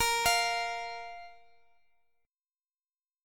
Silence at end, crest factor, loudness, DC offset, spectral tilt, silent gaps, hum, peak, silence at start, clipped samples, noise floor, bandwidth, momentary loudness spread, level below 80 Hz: 1.9 s; 20 dB; -30 LUFS; under 0.1%; 0.5 dB/octave; none; none; -14 dBFS; 0 s; under 0.1%; under -90 dBFS; 17.5 kHz; 19 LU; -58 dBFS